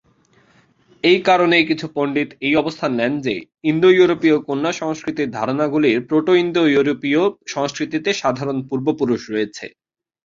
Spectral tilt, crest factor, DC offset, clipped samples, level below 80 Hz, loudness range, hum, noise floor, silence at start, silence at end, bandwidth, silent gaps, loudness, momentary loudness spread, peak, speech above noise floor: -5.5 dB/octave; 18 dB; under 0.1%; under 0.1%; -60 dBFS; 3 LU; none; -56 dBFS; 1.05 s; 0.55 s; 7.6 kHz; none; -18 LUFS; 10 LU; -2 dBFS; 38 dB